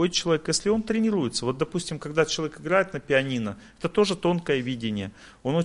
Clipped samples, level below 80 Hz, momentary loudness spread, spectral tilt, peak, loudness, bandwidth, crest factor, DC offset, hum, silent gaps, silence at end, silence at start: under 0.1%; -54 dBFS; 7 LU; -4.5 dB/octave; -8 dBFS; -26 LUFS; 11.5 kHz; 18 dB; under 0.1%; none; none; 0 s; 0 s